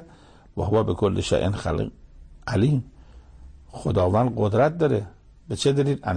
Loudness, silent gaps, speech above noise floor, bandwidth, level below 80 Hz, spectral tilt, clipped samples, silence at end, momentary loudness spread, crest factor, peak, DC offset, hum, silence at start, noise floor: -23 LUFS; none; 28 dB; 9.8 kHz; -44 dBFS; -7 dB/octave; under 0.1%; 0 s; 15 LU; 16 dB; -8 dBFS; under 0.1%; none; 0 s; -50 dBFS